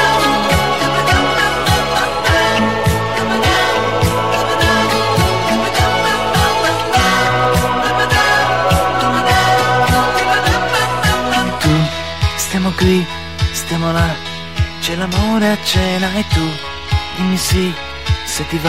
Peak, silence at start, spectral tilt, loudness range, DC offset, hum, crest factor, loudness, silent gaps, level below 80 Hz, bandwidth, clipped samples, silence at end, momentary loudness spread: -2 dBFS; 0 s; -4.5 dB/octave; 4 LU; 2%; none; 12 dB; -14 LUFS; none; -28 dBFS; 16 kHz; under 0.1%; 0 s; 6 LU